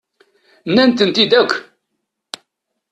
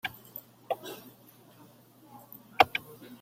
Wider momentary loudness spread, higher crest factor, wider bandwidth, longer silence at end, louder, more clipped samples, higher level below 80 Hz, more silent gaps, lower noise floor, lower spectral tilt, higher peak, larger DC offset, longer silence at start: second, 21 LU vs 24 LU; second, 18 dB vs 32 dB; second, 11 kHz vs 16.5 kHz; first, 1.3 s vs 0.05 s; first, -14 LUFS vs -30 LUFS; neither; first, -62 dBFS vs -70 dBFS; neither; first, -75 dBFS vs -57 dBFS; first, -4.5 dB/octave vs -3 dB/octave; first, 0 dBFS vs -4 dBFS; neither; first, 0.65 s vs 0.05 s